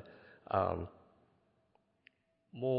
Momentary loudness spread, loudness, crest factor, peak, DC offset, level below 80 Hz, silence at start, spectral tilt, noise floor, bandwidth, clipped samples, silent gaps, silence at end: 23 LU; -37 LUFS; 22 dB; -18 dBFS; under 0.1%; -64 dBFS; 0 s; -6.5 dB/octave; -75 dBFS; 5 kHz; under 0.1%; none; 0 s